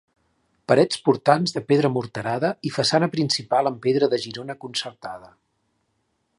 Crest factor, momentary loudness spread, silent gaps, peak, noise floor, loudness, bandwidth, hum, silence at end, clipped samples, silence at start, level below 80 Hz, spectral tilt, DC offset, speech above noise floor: 22 dB; 14 LU; none; 0 dBFS; -72 dBFS; -22 LUFS; 11.5 kHz; none; 1.1 s; under 0.1%; 0.7 s; -66 dBFS; -5 dB/octave; under 0.1%; 50 dB